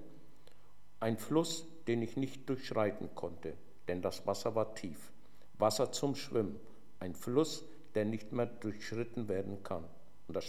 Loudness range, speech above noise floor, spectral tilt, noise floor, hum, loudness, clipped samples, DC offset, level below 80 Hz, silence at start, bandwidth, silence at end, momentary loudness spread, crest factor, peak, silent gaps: 2 LU; 27 dB; -5.5 dB/octave; -64 dBFS; none; -38 LUFS; under 0.1%; 0.6%; -68 dBFS; 0 s; 16.5 kHz; 0 s; 13 LU; 22 dB; -16 dBFS; none